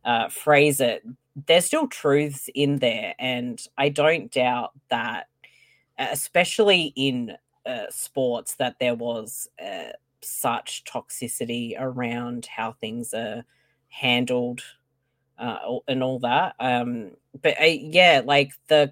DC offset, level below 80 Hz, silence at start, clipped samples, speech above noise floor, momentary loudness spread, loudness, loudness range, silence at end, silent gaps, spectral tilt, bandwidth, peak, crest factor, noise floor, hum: under 0.1%; -70 dBFS; 0.05 s; under 0.1%; 50 dB; 15 LU; -23 LUFS; 8 LU; 0 s; none; -3.5 dB/octave; 17 kHz; -2 dBFS; 22 dB; -74 dBFS; none